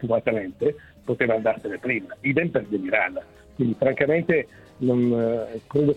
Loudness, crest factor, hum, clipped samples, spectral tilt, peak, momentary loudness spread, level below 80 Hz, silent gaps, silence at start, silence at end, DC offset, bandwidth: -24 LUFS; 20 dB; none; under 0.1%; -9 dB/octave; -4 dBFS; 8 LU; -56 dBFS; none; 0 s; 0 s; under 0.1%; 8.6 kHz